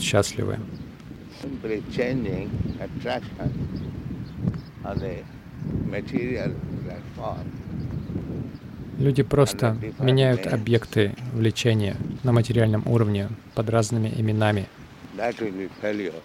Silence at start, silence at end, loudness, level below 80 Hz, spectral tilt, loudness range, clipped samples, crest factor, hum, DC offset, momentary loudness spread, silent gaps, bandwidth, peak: 0 s; 0 s; -26 LUFS; -46 dBFS; -6.5 dB/octave; 8 LU; under 0.1%; 18 dB; none; under 0.1%; 14 LU; none; 15 kHz; -6 dBFS